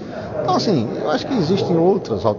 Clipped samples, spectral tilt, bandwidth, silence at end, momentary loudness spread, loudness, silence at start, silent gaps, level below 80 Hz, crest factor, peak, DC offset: under 0.1%; -7 dB/octave; 7.4 kHz; 0 s; 5 LU; -19 LUFS; 0 s; none; -50 dBFS; 16 dB; -2 dBFS; under 0.1%